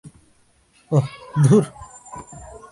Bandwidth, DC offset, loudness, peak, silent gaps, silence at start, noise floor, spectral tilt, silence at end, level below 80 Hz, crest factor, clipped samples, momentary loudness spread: 11.5 kHz; under 0.1%; -19 LUFS; -4 dBFS; none; 0.05 s; -58 dBFS; -8 dB/octave; 0.15 s; -52 dBFS; 18 dB; under 0.1%; 24 LU